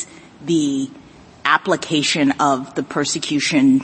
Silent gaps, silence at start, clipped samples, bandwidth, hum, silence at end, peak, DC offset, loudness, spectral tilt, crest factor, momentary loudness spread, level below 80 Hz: none; 0 s; under 0.1%; 8.8 kHz; none; 0 s; 0 dBFS; under 0.1%; -18 LUFS; -3.5 dB/octave; 18 dB; 9 LU; -60 dBFS